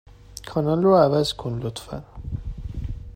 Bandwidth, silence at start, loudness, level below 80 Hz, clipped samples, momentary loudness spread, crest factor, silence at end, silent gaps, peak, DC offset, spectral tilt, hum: 16 kHz; 0.3 s; -22 LUFS; -38 dBFS; under 0.1%; 19 LU; 18 dB; 0.05 s; none; -6 dBFS; under 0.1%; -7 dB/octave; none